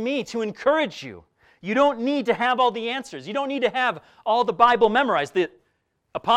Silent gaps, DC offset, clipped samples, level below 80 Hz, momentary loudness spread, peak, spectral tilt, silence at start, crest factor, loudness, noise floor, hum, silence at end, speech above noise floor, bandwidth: none; under 0.1%; under 0.1%; -62 dBFS; 12 LU; -4 dBFS; -4.5 dB/octave; 0 s; 18 dB; -22 LUFS; -71 dBFS; none; 0 s; 49 dB; 11.5 kHz